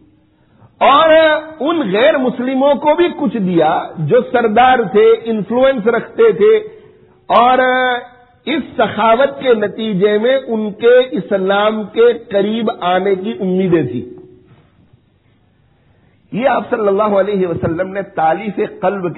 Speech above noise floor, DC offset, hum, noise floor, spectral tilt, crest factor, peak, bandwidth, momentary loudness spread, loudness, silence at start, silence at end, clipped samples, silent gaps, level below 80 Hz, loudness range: 41 dB; under 0.1%; none; -54 dBFS; -4 dB/octave; 14 dB; 0 dBFS; 4.1 kHz; 8 LU; -13 LUFS; 0.8 s; 0 s; under 0.1%; none; -52 dBFS; 7 LU